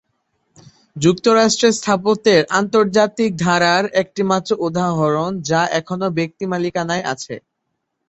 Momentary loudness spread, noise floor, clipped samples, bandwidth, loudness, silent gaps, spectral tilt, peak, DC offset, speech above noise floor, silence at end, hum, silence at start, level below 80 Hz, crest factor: 8 LU; -74 dBFS; under 0.1%; 8.2 kHz; -17 LUFS; none; -4.5 dB/octave; -2 dBFS; under 0.1%; 57 dB; 0.7 s; none; 0.95 s; -56 dBFS; 16 dB